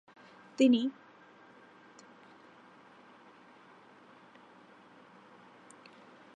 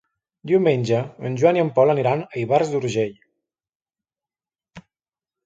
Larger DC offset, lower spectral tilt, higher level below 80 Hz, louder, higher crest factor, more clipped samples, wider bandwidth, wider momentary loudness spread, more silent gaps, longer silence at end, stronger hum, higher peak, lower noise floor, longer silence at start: neither; second, -4.5 dB/octave vs -7 dB/octave; second, under -90 dBFS vs -64 dBFS; second, -28 LUFS vs -20 LUFS; about the same, 22 dB vs 18 dB; neither; about the same, 9.4 kHz vs 8.8 kHz; first, 29 LU vs 8 LU; second, none vs 3.75-3.80 s; first, 5.45 s vs 0.65 s; neither; second, -14 dBFS vs -4 dBFS; second, -58 dBFS vs under -90 dBFS; first, 0.6 s vs 0.45 s